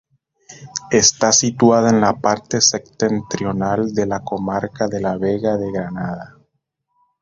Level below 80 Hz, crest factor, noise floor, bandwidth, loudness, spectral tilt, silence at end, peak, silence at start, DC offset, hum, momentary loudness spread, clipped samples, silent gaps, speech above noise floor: -50 dBFS; 18 dB; -72 dBFS; 7.8 kHz; -17 LUFS; -3.5 dB/octave; 0.95 s; 0 dBFS; 0.5 s; under 0.1%; none; 12 LU; under 0.1%; none; 55 dB